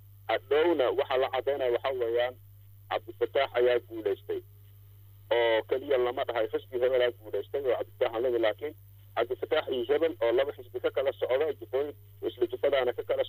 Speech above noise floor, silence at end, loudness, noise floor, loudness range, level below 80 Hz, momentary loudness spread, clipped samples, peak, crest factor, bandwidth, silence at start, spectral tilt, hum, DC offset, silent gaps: 24 dB; 0 s; -30 LUFS; -53 dBFS; 1 LU; -66 dBFS; 9 LU; under 0.1%; -16 dBFS; 14 dB; 16 kHz; 0.25 s; -6.5 dB/octave; none; under 0.1%; none